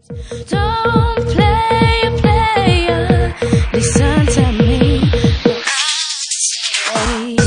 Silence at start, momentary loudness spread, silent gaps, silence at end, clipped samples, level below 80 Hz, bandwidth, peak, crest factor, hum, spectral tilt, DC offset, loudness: 0.1 s; 4 LU; none; 0 s; under 0.1%; -24 dBFS; 10.5 kHz; 0 dBFS; 14 dB; none; -4.5 dB/octave; under 0.1%; -14 LUFS